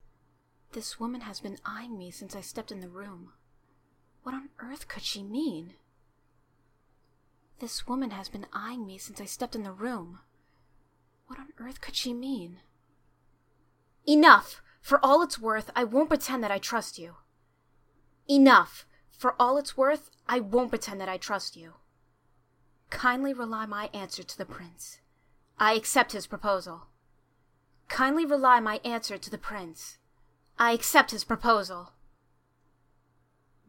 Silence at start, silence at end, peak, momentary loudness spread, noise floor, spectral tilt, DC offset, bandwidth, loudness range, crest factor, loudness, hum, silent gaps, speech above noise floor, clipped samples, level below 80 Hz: 0.75 s; 1.8 s; -2 dBFS; 23 LU; -69 dBFS; -3 dB/octave; under 0.1%; 17 kHz; 16 LU; 28 dB; -26 LUFS; none; none; 41 dB; under 0.1%; -58 dBFS